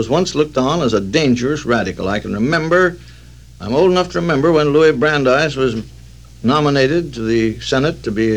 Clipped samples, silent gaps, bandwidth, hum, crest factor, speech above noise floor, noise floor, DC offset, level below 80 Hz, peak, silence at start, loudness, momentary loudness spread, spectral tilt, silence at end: under 0.1%; none; 11.5 kHz; none; 14 dB; 24 dB; -39 dBFS; 0.4%; -40 dBFS; -2 dBFS; 0 s; -15 LUFS; 7 LU; -5.5 dB/octave; 0 s